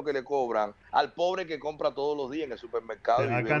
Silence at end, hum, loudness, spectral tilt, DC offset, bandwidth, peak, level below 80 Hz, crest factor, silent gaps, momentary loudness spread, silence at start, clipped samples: 0 s; none; -30 LUFS; -6 dB/octave; under 0.1%; 7.4 kHz; -10 dBFS; -64 dBFS; 18 dB; none; 8 LU; 0 s; under 0.1%